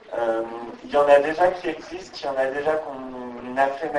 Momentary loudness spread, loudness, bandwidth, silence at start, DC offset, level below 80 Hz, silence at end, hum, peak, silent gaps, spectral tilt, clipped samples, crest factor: 18 LU; -22 LUFS; 11 kHz; 0.05 s; under 0.1%; -58 dBFS; 0 s; none; -4 dBFS; none; -5 dB/octave; under 0.1%; 20 dB